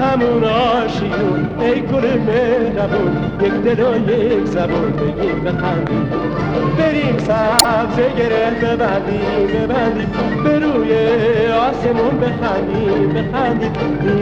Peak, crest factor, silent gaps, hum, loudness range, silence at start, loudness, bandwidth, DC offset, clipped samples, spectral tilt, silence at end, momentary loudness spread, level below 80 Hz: 0 dBFS; 16 dB; none; none; 1 LU; 0 s; -16 LUFS; 16 kHz; 0.3%; under 0.1%; -5.5 dB/octave; 0 s; 4 LU; -36 dBFS